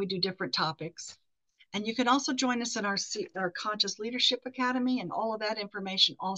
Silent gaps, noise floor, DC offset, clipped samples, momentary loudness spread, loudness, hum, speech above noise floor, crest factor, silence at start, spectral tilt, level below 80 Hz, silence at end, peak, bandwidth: none; -68 dBFS; under 0.1%; under 0.1%; 9 LU; -30 LUFS; none; 37 dB; 22 dB; 0 s; -3 dB/octave; -80 dBFS; 0 s; -10 dBFS; 8.6 kHz